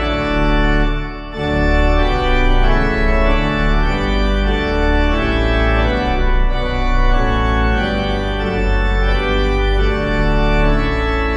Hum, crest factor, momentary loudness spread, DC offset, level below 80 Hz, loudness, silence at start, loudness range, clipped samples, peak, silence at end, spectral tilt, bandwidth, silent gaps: none; 12 dB; 3 LU; under 0.1%; -16 dBFS; -17 LUFS; 0 s; 1 LU; under 0.1%; -2 dBFS; 0 s; -7 dB/octave; 7.4 kHz; none